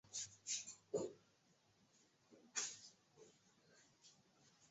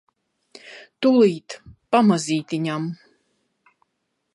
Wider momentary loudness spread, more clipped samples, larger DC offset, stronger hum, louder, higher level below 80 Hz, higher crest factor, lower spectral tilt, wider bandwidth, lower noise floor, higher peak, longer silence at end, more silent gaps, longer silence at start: about the same, 23 LU vs 24 LU; neither; neither; neither; second, -48 LUFS vs -20 LUFS; second, -90 dBFS vs -64 dBFS; first, 24 dB vs 18 dB; second, -1.5 dB/octave vs -6 dB/octave; second, 8.2 kHz vs 11.5 kHz; about the same, -77 dBFS vs -75 dBFS; second, -30 dBFS vs -4 dBFS; second, 0.05 s vs 1.4 s; neither; second, 0.05 s vs 0.65 s